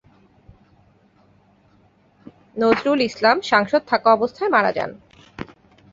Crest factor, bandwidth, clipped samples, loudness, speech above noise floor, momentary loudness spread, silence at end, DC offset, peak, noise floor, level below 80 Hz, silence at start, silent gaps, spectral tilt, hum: 20 dB; 7.8 kHz; under 0.1%; -19 LUFS; 39 dB; 20 LU; 0.5 s; under 0.1%; -2 dBFS; -57 dBFS; -58 dBFS; 2.55 s; none; -5 dB/octave; none